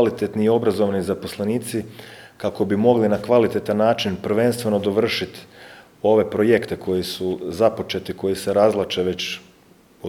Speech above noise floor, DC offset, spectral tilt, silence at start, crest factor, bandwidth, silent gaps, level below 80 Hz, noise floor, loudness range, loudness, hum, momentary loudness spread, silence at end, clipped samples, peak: 32 dB; under 0.1%; -5.5 dB/octave; 0 s; 18 dB; 18.5 kHz; none; -56 dBFS; -52 dBFS; 2 LU; -21 LUFS; none; 10 LU; 0 s; under 0.1%; -2 dBFS